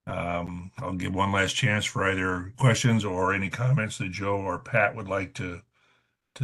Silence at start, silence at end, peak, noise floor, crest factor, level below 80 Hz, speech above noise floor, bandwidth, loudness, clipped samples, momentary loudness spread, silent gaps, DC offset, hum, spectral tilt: 0.05 s; 0 s; -8 dBFS; -69 dBFS; 20 dB; -48 dBFS; 43 dB; 12.5 kHz; -26 LUFS; under 0.1%; 11 LU; none; under 0.1%; none; -5 dB/octave